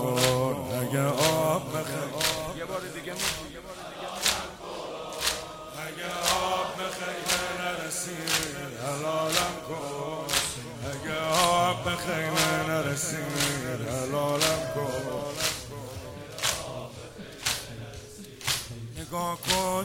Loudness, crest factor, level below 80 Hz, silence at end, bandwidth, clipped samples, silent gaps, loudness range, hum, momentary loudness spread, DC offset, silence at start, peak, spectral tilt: -28 LUFS; 22 dB; -54 dBFS; 0 s; 16.5 kHz; under 0.1%; none; 5 LU; none; 14 LU; under 0.1%; 0 s; -6 dBFS; -3 dB/octave